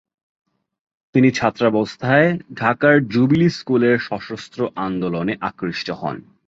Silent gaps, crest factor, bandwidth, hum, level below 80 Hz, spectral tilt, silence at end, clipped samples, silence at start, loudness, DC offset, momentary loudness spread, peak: none; 18 dB; 7.8 kHz; none; -54 dBFS; -7 dB/octave; 0.25 s; under 0.1%; 1.15 s; -19 LUFS; under 0.1%; 10 LU; -2 dBFS